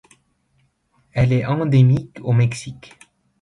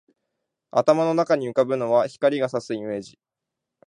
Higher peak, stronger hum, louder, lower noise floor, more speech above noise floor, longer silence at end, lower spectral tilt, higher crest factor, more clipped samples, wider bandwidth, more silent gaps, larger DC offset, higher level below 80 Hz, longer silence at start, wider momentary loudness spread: about the same, -4 dBFS vs -4 dBFS; neither; first, -18 LUFS vs -22 LUFS; second, -64 dBFS vs -84 dBFS; second, 47 dB vs 63 dB; about the same, 0.7 s vs 0.8 s; first, -7.5 dB/octave vs -6 dB/octave; second, 14 dB vs 20 dB; neither; about the same, 10.5 kHz vs 10.5 kHz; neither; neither; first, -46 dBFS vs -70 dBFS; first, 1.15 s vs 0.75 s; first, 14 LU vs 10 LU